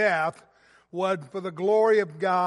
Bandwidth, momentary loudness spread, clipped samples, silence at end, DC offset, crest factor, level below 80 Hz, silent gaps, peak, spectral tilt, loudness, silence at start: 11.5 kHz; 11 LU; under 0.1%; 0 s; under 0.1%; 14 dB; -78 dBFS; none; -10 dBFS; -6 dB/octave; -25 LUFS; 0 s